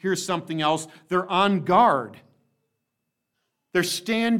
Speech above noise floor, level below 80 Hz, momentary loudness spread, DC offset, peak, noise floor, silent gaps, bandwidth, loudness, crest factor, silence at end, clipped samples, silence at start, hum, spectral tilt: 57 dB; -70 dBFS; 9 LU; under 0.1%; -6 dBFS; -80 dBFS; none; 17 kHz; -23 LUFS; 18 dB; 0 s; under 0.1%; 0.05 s; none; -4.5 dB/octave